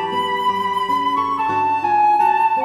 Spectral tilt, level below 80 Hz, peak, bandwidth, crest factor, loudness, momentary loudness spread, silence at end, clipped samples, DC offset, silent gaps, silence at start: -4.5 dB/octave; -60 dBFS; -6 dBFS; 13.5 kHz; 12 dB; -17 LUFS; 5 LU; 0 s; under 0.1%; under 0.1%; none; 0 s